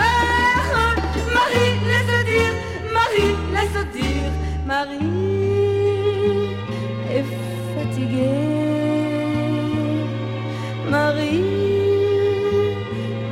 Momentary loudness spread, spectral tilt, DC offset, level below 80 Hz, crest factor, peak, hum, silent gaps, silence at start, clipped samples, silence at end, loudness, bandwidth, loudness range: 9 LU; -6 dB/octave; under 0.1%; -34 dBFS; 14 dB; -6 dBFS; none; none; 0 s; under 0.1%; 0 s; -20 LUFS; 16 kHz; 3 LU